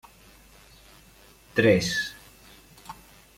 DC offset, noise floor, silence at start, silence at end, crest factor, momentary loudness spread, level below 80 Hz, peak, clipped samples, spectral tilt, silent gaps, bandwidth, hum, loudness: under 0.1%; -54 dBFS; 1.55 s; 0.45 s; 22 dB; 26 LU; -56 dBFS; -8 dBFS; under 0.1%; -4.5 dB/octave; none; 16.5 kHz; none; -24 LUFS